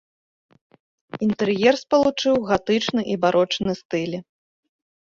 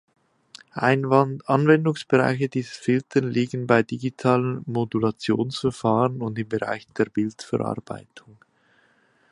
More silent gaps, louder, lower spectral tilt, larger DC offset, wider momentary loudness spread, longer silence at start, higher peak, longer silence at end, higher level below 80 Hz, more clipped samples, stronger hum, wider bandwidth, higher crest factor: first, 3.85-3.89 s vs none; about the same, -21 LUFS vs -23 LUFS; second, -5 dB/octave vs -7 dB/octave; neither; about the same, 8 LU vs 9 LU; first, 1.15 s vs 0.75 s; about the same, -4 dBFS vs -2 dBFS; second, 0.9 s vs 1.15 s; first, -56 dBFS vs -62 dBFS; neither; neither; second, 7.6 kHz vs 11 kHz; about the same, 20 dB vs 22 dB